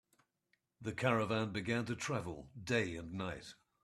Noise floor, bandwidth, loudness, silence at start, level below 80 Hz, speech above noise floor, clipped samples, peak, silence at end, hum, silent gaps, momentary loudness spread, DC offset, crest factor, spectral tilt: -82 dBFS; 13 kHz; -38 LUFS; 0.8 s; -68 dBFS; 43 dB; under 0.1%; -16 dBFS; 0.3 s; none; none; 13 LU; under 0.1%; 22 dB; -5.5 dB/octave